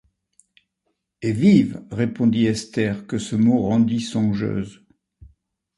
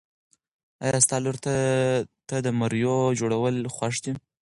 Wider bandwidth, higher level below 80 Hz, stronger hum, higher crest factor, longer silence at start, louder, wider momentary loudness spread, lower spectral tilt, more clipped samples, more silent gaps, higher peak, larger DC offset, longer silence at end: about the same, 11.5 kHz vs 11.5 kHz; first, -52 dBFS vs -60 dBFS; neither; about the same, 18 dB vs 22 dB; first, 1.2 s vs 0.8 s; first, -20 LUFS vs -25 LUFS; about the same, 11 LU vs 9 LU; first, -7 dB/octave vs -4.5 dB/octave; neither; neither; about the same, -4 dBFS vs -4 dBFS; neither; first, 1.05 s vs 0.2 s